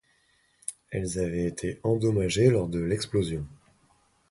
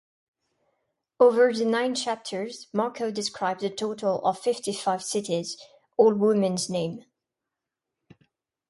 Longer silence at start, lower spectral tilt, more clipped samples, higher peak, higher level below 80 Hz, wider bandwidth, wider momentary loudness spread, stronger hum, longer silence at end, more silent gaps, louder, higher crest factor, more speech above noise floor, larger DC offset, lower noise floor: second, 0.7 s vs 1.2 s; first, -6 dB/octave vs -4.5 dB/octave; neither; about the same, -8 dBFS vs -6 dBFS; first, -48 dBFS vs -74 dBFS; about the same, 11.5 kHz vs 11.5 kHz; first, 16 LU vs 12 LU; neither; second, 0.75 s vs 1.7 s; neither; about the same, -27 LUFS vs -25 LUFS; about the same, 20 dB vs 20 dB; second, 41 dB vs 62 dB; neither; second, -67 dBFS vs -86 dBFS